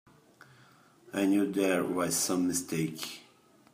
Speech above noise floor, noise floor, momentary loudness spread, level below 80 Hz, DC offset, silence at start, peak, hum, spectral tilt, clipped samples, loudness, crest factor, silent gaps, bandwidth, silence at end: 31 dB; -60 dBFS; 12 LU; -74 dBFS; under 0.1%; 1.15 s; -14 dBFS; none; -4 dB/octave; under 0.1%; -30 LUFS; 18 dB; none; 15.5 kHz; 0.5 s